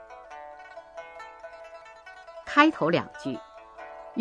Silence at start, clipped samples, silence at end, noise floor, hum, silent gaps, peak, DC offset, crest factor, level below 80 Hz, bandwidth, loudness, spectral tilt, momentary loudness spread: 0 s; under 0.1%; 0 s; -48 dBFS; none; none; -4 dBFS; under 0.1%; 26 dB; -66 dBFS; 9.8 kHz; -25 LUFS; -5.5 dB/octave; 25 LU